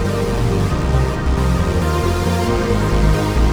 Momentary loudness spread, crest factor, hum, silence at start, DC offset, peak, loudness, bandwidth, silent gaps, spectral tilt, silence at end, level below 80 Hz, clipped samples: 2 LU; 12 dB; none; 0 s; under 0.1%; -2 dBFS; -17 LUFS; over 20 kHz; none; -6.5 dB/octave; 0 s; -20 dBFS; under 0.1%